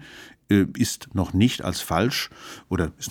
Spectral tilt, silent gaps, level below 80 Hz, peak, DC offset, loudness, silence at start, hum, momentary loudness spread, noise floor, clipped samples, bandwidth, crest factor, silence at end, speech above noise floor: -5 dB/octave; none; -46 dBFS; -4 dBFS; under 0.1%; -24 LUFS; 0 s; none; 10 LU; -46 dBFS; under 0.1%; 19 kHz; 20 dB; 0 s; 22 dB